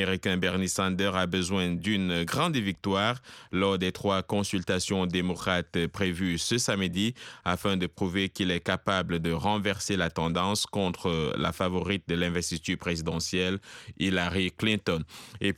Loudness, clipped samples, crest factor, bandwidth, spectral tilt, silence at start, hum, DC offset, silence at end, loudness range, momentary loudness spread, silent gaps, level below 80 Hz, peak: -28 LUFS; under 0.1%; 18 dB; 15.5 kHz; -4.5 dB/octave; 0 s; none; under 0.1%; 0 s; 1 LU; 4 LU; none; -52 dBFS; -10 dBFS